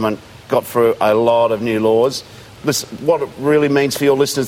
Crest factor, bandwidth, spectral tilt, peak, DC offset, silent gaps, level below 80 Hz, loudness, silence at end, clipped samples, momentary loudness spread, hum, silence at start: 14 dB; 16.5 kHz; -4.5 dB/octave; -2 dBFS; under 0.1%; none; -54 dBFS; -16 LUFS; 0 s; under 0.1%; 6 LU; none; 0 s